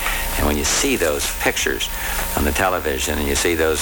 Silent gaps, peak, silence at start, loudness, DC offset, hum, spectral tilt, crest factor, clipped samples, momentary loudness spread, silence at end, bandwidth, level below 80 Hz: none; -4 dBFS; 0 s; -19 LUFS; under 0.1%; none; -3 dB/octave; 16 dB; under 0.1%; 4 LU; 0 s; over 20 kHz; -28 dBFS